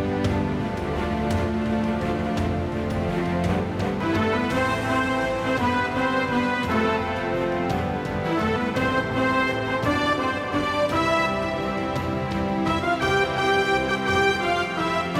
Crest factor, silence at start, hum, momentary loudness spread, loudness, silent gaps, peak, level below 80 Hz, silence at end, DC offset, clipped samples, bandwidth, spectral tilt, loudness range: 14 dB; 0 s; none; 5 LU; -23 LUFS; none; -10 dBFS; -42 dBFS; 0 s; under 0.1%; under 0.1%; 16 kHz; -6 dB/octave; 2 LU